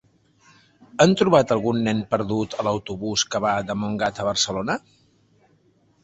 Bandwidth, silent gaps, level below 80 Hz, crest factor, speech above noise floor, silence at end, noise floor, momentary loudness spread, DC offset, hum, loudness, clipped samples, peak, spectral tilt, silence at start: 8.2 kHz; none; -54 dBFS; 22 dB; 39 dB; 1.25 s; -61 dBFS; 9 LU; under 0.1%; none; -22 LUFS; under 0.1%; 0 dBFS; -4.5 dB/octave; 0.95 s